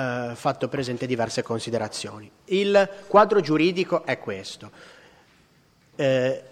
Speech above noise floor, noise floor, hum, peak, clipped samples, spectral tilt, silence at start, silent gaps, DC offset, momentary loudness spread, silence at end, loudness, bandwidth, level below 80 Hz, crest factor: 36 dB; -60 dBFS; none; -2 dBFS; under 0.1%; -5.5 dB/octave; 0 s; none; under 0.1%; 15 LU; 0.05 s; -24 LUFS; 12.5 kHz; -64 dBFS; 22 dB